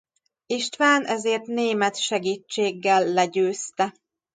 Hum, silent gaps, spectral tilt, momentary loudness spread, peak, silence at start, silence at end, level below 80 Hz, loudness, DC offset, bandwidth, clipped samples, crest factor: none; none; -3 dB/octave; 8 LU; -6 dBFS; 0.5 s; 0.45 s; -76 dBFS; -23 LUFS; under 0.1%; 9.6 kHz; under 0.1%; 18 dB